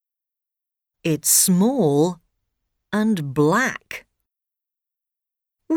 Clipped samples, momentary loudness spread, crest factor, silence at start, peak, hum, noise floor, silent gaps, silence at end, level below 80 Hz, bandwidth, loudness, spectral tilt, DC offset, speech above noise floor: under 0.1%; 19 LU; 18 dB; 1.05 s; -6 dBFS; none; -87 dBFS; none; 0 s; -62 dBFS; over 20 kHz; -19 LUFS; -4 dB/octave; under 0.1%; 68 dB